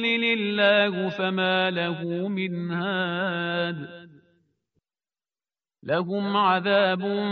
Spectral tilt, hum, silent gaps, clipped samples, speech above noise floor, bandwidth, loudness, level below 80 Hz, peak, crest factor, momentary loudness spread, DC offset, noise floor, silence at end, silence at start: -3 dB/octave; none; none; under 0.1%; over 66 dB; 6.2 kHz; -24 LUFS; -70 dBFS; -6 dBFS; 18 dB; 8 LU; under 0.1%; under -90 dBFS; 0 s; 0 s